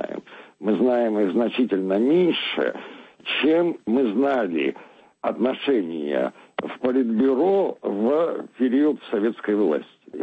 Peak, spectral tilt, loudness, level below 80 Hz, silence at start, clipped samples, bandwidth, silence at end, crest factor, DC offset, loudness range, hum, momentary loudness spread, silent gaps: -10 dBFS; -7.5 dB/octave; -22 LUFS; -70 dBFS; 0 s; under 0.1%; 7.8 kHz; 0 s; 14 dB; under 0.1%; 2 LU; none; 10 LU; none